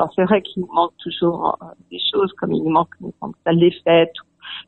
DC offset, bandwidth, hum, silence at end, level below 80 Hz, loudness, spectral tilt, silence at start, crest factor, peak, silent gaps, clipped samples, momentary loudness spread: under 0.1%; 4.2 kHz; none; 0.05 s; -60 dBFS; -19 LUFS; -9 dB/octave; 0 s; 16 dB; -2 dBFS; none; under 0.1%; 16 LU